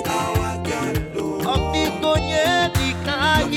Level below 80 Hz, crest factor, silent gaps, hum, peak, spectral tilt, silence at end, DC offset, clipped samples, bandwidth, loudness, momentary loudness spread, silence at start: -32 dBFS; 16 dB; none; none; -6 dBFS; -4.5 dB/octave; 0 s; under 0.1%; under 0.1%; 18 kHz; -21 LUFS; 6 LU; 0 s